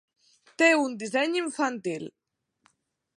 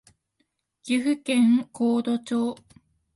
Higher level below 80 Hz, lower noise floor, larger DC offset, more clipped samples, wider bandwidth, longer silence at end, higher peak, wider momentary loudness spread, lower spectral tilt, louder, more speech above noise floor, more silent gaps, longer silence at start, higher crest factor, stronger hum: second, -84 dBFS vs -70 dBFS; second, -69 dBFS vs -74 dBFS; neither; neither; about the same, 11.5 kHz vs 11.5 kHz; first, 1.1 s vs 0.6 s; first, -8 dBFS vs -12 dBFS; first, 14 LU vs 11 LU; second, -3.5 dB/octave vs -5 dB/octave; about the same, -25 LUFS vs -24 LUFS; second, 43 dB vs 51 dB; neither; second, 0.6 s vs 0.85 s; first, 20 dB vs 14 dB; neither